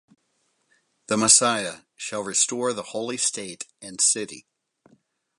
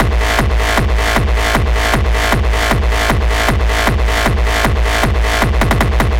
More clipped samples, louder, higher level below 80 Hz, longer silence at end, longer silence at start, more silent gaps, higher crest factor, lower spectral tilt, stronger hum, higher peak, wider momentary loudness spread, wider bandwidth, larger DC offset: neither; second, -21 LUFS vs -14 LUFS; second, -72 dBFS vs -16 dBFS; first, 1 s vs 0 s; first, 1.1 s vs 0 s; neither; first, 24 dB vs 12 dB; second, -1.5 dB/octave vs -4.5 dB/octave; neither; about the same, -2 dBFS vs 0 dBFS; first, 20 LU vs 1 LU; second, 11.5 kHz vs 16.5 kHz; second, under 0.1% vs 0.9%